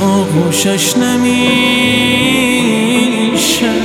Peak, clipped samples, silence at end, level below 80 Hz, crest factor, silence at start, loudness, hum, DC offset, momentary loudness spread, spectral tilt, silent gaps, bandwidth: 0 dBFS; under 0.1%; 0 s; -42 dBFS; 12 dB; 0 s; -11 LUFS; none; under 0.1%; 2 LU; -3.5 dB/octave; none; 17 kHz